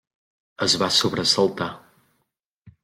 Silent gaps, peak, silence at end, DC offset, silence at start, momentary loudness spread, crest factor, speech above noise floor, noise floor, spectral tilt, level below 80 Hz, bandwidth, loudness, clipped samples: 2.46-2.62 s; -6 dBFS; 0.15 s; under 0.1%; 0.6 s; 11 LU; 20 dB; 54 dB; -75 dBFS; -3 dB/octave; -62 dBFS; 16.5 kHz; -20 LUFS; under 0.1%